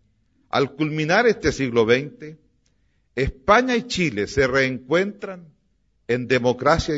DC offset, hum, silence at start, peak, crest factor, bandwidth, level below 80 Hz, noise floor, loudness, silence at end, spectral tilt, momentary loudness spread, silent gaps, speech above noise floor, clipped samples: under 0.1%; none; 0.55 s; -2 dBFS; 20 dB; 8 kHz; -42 dBFS; -66 dBFS; -21 LUFS; 0 s; -5 dB/octave; 17 LU; none; 46 dB; under 0.1%